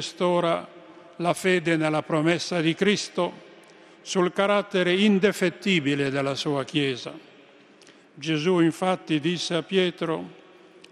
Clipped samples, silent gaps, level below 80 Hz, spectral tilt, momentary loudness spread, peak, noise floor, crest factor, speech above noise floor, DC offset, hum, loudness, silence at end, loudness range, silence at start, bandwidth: under 0.1%; none; -70 dBFS; -5 dB/octave; 8 LU; -8 dBFS; -53 dBFS; 18 dB; 29 dB; under 0.1%; none; -24 LUFS; 0.6 s; 3 LU; 0 s; 13 kHz